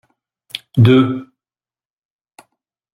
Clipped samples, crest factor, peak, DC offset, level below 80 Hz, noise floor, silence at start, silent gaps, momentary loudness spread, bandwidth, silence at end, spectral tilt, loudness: under 0.1%; 16 dB; -2 dBFS; under 0.1%; -54 dBFS; under -90 dBFS; 0.55 s; none; 20 LU; 12 kHz; 1.7 s; -8.5 dB/octave; -13 LUFS